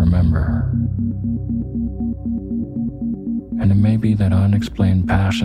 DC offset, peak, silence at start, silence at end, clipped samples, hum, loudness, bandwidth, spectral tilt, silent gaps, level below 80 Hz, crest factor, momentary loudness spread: under 0.1%; -4 dBFS; 0 s; 0 s; under 0.1%; none; -19 LUFS; 9.4 kHz; -8 dB/octave; none; -30 dBFS; 14 dB; 9 LU